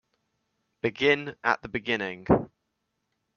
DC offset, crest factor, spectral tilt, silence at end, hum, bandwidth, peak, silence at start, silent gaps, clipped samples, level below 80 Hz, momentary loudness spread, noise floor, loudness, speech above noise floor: under 0.1%; 24 dB; -6 dB/octave; 0.9 s; none; 7 kHz; -6 dBFS; 0.85 s; none; under 0.1%; -54 dBFS; 8 LU; -79 dBFS; -27 LUFS; 53 dB